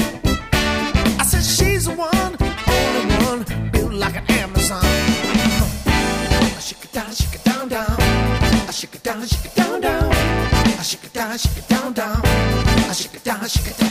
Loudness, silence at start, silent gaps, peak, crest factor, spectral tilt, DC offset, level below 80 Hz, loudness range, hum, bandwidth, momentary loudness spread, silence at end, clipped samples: -18 LUFS; 0 s; none; -2 dBFS; 16 dB; -4.5 dB/octave; under 0.1%; -24 dBFS; 2 LU; none; 15.5 kHz; 7 LU; 0 s; under 0.1%